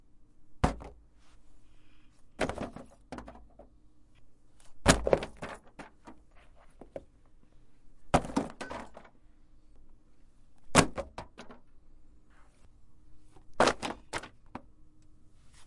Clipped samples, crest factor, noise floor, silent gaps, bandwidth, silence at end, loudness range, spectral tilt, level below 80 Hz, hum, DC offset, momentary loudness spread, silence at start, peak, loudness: under 0.1%; 32 dB; -59 dBFS; none; 11.5 kHz; 0 s; 6 LU; -4 dB/octave; -48 dBFS; none; under 0.1%; 26 LU; 0.05 s; -4 dBFS; -31 LUFS